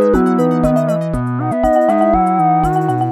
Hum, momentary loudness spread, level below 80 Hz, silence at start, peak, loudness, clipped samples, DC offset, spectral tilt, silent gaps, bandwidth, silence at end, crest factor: none; 6 LU; -32 dBFS; 0 s; -2 dBFS; -14 LUFS; under 0.1%; under 0.1%; -8.5 dB/octave; none; 14 kHz; 0 s; 12 dB